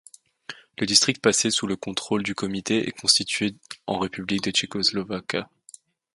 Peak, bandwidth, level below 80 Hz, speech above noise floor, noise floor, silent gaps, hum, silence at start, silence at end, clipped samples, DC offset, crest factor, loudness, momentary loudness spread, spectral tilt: 0 dBFS; 11.5 kHz; -60 dBFS; 27 dB; -51 dBFS; none; none; 0.5 s; 0.7 s; under 0.1%; under 0.1%; 26 dB; -23 LUFS; 17 LU; -2.5 dB/octave